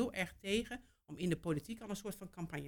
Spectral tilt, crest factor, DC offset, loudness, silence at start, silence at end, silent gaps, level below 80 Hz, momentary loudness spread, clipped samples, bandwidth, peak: -5 dB/octave; 20 dB; under 0.1%; -41 LUFS; 0 s; 0 s; none; -62 dBFS; 10 LU; under 0.1%; 19 kHz; -20 dBFS